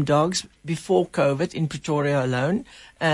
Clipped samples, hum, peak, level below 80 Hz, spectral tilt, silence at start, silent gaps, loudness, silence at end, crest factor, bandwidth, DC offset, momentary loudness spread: under 0.1%; none; -6 dBFS; -56 dBFS; -5.5 dB/octave; 0 s; none; -24 LUFS; 0 s; 16 dB; 11.5 kHz; under 0.1%; 8 LU